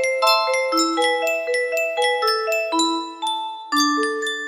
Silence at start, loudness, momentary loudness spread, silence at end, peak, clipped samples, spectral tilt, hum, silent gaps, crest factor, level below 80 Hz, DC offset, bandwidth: 0 s; -20 LUFS; 8 LU; 0 s; -4 dBFS; under 0.1%; 0.5 dB/octave; none; none; 16 dB; -72 dBFS; under 0.1%; 15.5 kHz